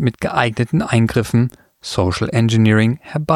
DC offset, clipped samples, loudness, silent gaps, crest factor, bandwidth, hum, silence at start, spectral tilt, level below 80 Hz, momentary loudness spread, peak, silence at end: under 0.1%; under 0.1%; -17 LUFS; none; 16 dB; 13.5 kHz; none; 0 s; -6.5 dB/octave; -42 dBFS; 9 LU; -2 dBFS; 0 s